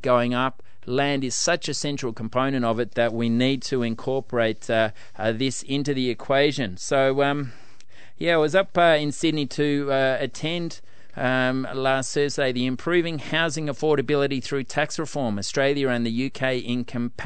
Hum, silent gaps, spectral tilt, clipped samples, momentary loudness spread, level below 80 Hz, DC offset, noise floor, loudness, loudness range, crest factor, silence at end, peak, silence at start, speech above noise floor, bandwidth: none; none; -4.5 dB/octave; under 0.1%; 7 LU; -60 dBFS; 2%; -53 dBFS; -24 LUFS; 2 LU; 18 dB; 0 s; -6 dBFS; 0 s; 29 dB; 9.2 kHz